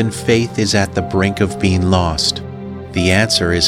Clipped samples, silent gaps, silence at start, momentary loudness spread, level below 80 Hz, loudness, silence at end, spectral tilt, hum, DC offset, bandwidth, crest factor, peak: under 0.1%; none; 0 s; 9 LU; -34 dBFS; -15 LUFS; 0 s; -4.5 dB/octave; none; under 0.1%; 15.5 kHz; 14 dB; -2 dBFS